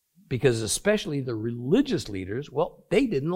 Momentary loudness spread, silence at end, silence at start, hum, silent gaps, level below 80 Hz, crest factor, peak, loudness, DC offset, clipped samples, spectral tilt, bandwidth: 8 LU; 0 s; 0.3 s; none; none; -52 dBFS; 18 dB; -8 dBFS; -26 LUFS; under 0.1%; under 0.1%; -5 dB/octave; 16.5 kHz